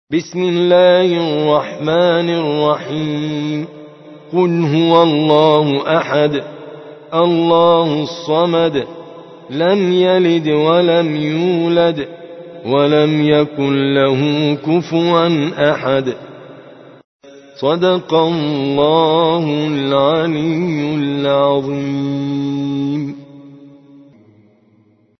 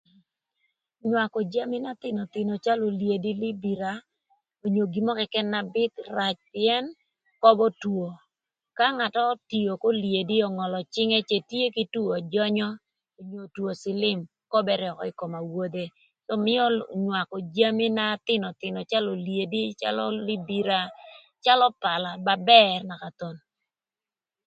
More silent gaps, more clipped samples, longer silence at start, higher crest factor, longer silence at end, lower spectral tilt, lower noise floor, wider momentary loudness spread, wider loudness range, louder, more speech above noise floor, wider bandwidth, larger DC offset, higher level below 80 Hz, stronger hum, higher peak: first, 17.04-17.20 s vs none; neither; second, 0.1 s vs 1.05 s; second, 14 dB vs 26 dB; first, 1.5 s vs 1.1 s; about the same, -7 dB/octave vs -6 dB/octave; second, -53 dBFS vs under -90 dBFS; about the same, 11 LU vs 12 LU; about the same, 4 LU vs 6 LU; first, -14 LUFS vs -25 LUFS; second, 39 dB vs over 65 dB; second, 6.2 kHz vs 7.8 kHz; neither; first, -56 dBFS vs -74 dBFS; neither; about the same, 0 dBFS vs 0 dBFS